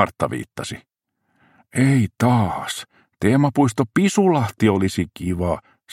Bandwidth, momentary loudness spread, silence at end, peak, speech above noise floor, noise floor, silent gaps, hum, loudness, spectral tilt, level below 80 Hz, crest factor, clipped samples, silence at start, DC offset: 16 kHz; 12 LU; 0.35 s; 0 dBFS; 50 dB; -69 dBFS; none; none; -20 LUFS; -6.5 dB/octave; -48 dBFS; 20 dB; under 0.1%; 0 s; under 0.1%